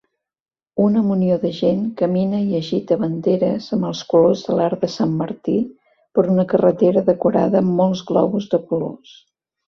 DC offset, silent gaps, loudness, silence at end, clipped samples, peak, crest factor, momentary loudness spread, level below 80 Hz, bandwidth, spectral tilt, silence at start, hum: under 0.1%; none; -18 LUFS; 0.75 s; under 0.1%; 0 dBFS; 18 dB; 7 LU; -58 dBFS; 6.6 kHz; -8 dB/octave; 0.75 s; none